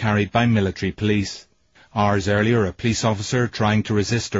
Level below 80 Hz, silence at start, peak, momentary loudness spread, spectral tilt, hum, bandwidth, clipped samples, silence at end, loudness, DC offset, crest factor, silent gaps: -46 dBFS; 0 s; -6 dBFS; 5 LU; -5.5 dB/octave; none; 8 kHz; under 0.1%; 0 s; -21 LUFS; under 0.1%; 14 dB; none